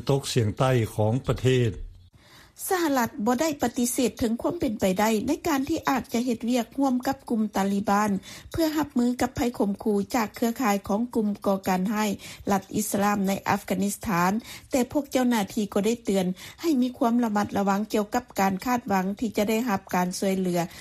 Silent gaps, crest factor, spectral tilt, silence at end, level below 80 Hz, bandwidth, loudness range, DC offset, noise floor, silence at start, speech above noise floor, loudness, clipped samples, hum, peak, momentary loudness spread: none; 16 dB; -5.5 dB/octave; 0 s; -52 dBFS; 15.5 kHz; 1 LU; under 0.1%; -53 dBFS; 0 s; 28 dB; -26 LUFS; under 0.1%; none; -8 dBFS; 4 LU